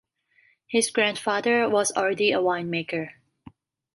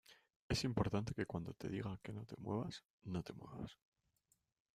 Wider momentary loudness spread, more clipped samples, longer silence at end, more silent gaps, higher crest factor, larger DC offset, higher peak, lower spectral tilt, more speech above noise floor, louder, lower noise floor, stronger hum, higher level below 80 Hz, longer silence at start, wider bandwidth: second, 8 LU vs 12 LU; neither; second, 0.85 s vs 1.05 s; second, none vs 0.36-0.50 s, 2.85-3.00 s; about the same, 18 dB vs 22 dB; neither; first, -8 dBFS vs -24 dBFS; second, -3 dB/octave vs -6 dB/octave; about the same, 40 dB vs 38 dB; first, -24 LUFS vs -45 LUFS; second, -64 dBFS vs -82 dBFS; neither; second, -70 dBFS vs -64 dBFS; first, 0.7 s vs 0.1 s; second, 12 kHz vs 15 kHz